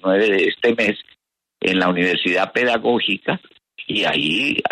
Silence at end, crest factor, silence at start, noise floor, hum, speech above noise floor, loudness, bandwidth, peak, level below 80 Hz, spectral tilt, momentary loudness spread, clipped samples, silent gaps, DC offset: 0.05 s; 14 dB; 0.05 s; -60 dBFS; none; 42 dB; -18 LUFS; 12 kHz; -4 dBFS; -60 dBFS; -5 dB/octave; 7 LU; under 0.1%; none; under 0.1%